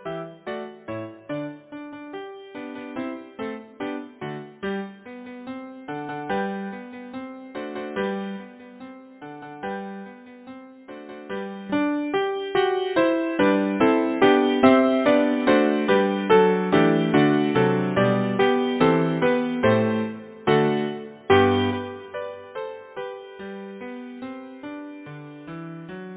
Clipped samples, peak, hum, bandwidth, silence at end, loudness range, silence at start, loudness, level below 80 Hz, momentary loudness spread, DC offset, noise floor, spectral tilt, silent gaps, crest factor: under 0.1%; -4 dBFS; none; 4 kHz; 0 s; 16 LU; 0 s; -22 LUFS; -56 dBFS; 20 LU; under 0.1%; -43 dBFS; -10.5 dB/octave; none; 20 dB